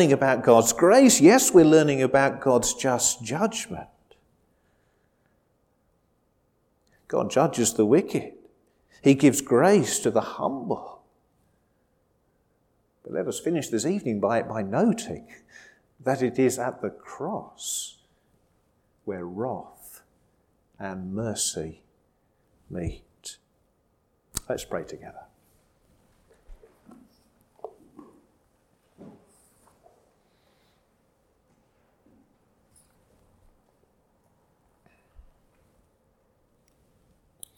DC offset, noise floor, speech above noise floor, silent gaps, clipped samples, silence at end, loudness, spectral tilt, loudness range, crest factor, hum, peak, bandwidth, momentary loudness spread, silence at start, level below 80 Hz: under 0.1%; -69 dBFS; 46 dB; none; under 0.1%; 8.5 s; -23 LUFS; -4.5 dB/octave; 18 LU; 24 dB; none; -2 dBFS; 17.5 kHz; 23 LU; 0 s; -58 dBFS